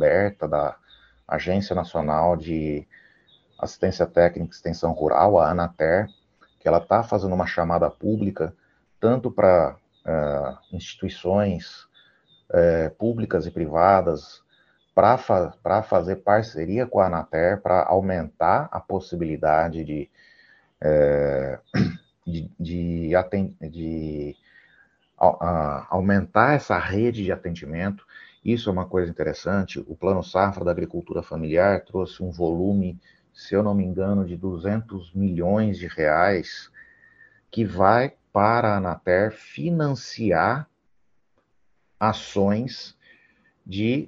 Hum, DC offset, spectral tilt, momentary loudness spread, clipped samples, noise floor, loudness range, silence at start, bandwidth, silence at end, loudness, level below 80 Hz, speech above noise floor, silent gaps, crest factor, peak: none; under 0.1%; -7.5 dB/octave; 12 LU; under 0.1%; -72 dBFS; 4 LU; 0 s; 7.4 kHz; 0 s; -23 LUFS; -48 dBFS; 50 dB; none; 22 dB; 0 dBFS